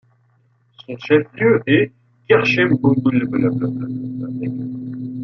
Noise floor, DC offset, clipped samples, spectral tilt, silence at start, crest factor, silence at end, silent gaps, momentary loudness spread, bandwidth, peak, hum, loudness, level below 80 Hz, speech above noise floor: -59 dBFS; under 0.1%; under 0.1%; -8 dB/octave; 0.8 s; 16 dB; 0 s; none; 13 LU; 6.4 kHz; -2 dBFS; none; -18 LUFS; -58 dBFS; 42 dB